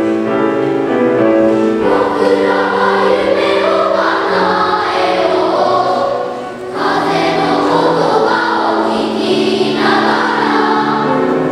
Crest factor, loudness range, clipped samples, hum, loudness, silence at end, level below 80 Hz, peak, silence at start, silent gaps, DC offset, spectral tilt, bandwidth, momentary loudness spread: 12 dB; 2 LU; under 0.1%; none; -13 LUFS; 0 s; -50 dBFS; 0 dBFS; 0 s; none; under 0.1%; -5.5 dB/octave; 12 kHz; 3 LU